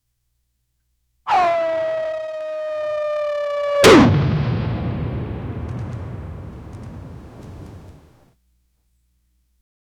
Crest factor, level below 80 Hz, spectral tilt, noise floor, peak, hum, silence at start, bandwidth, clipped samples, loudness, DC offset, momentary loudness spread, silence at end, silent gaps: 22 dB; -40 dBFS; -5.5 dB/octave; -70 dBFS; 0 dBFS; none; 1.25 s; 19 kHz; under 0.1%; -19 LUFS; under 0.1%; 25 LU; 2.1 s; none